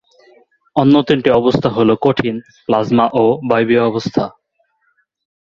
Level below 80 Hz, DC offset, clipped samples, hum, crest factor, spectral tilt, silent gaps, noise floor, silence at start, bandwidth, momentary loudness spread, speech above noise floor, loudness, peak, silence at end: -50 dBFS; under 0.1%; under 0.1%; none; 14 dB; -7.5 dB/octave; none; -63 dBFS; 0.75 s; 7.2 kHz; 9 LU; 50 dB; -14 LUFS; 0 dBFS; 1.1 s